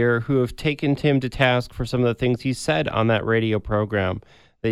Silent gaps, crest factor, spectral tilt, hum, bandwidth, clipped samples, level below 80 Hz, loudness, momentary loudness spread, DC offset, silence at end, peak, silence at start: none; 20 dB; -6.5 dB/octave; none; 13 kHz; under 0.1%; -42 dBFS; -22 LUFS; 5 LU; under 0.1%; 0 s; -2 dBFS; 0 s